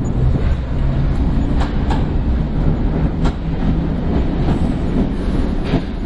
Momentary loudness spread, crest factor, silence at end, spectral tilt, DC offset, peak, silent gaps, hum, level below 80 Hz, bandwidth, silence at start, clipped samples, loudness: 2 LU; 14 dB; 0 s; -8.5 dB/octave; under 0.1%; -2 dBFS; none; none; -20 dBFS; 8.2 kHz; 0 s; under 0.1%; -19 LUFS